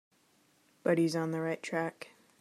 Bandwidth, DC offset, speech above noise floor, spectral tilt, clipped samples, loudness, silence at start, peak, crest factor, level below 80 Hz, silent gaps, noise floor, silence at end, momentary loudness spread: 14 kHz; under 0.1%; 37 dB; -6 dB/octave; under 0.1%; -33 LUFS; 0.85 s; -16 dBFS; 18 dB; -84 dBFS; none; -69 dBFS; 0.35 s; 16 LU